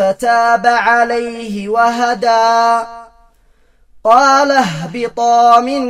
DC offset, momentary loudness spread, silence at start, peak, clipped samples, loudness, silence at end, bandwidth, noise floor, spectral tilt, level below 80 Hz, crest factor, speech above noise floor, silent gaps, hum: under 0.1%; 11 LU; 0 s; 0 dBFS; under 0.1%; -12 LUFS; 0 s; 13 kHz; -51 dBFS; -4 dB/octave; -50 dBFS; 12 dB; 39 dB; none; none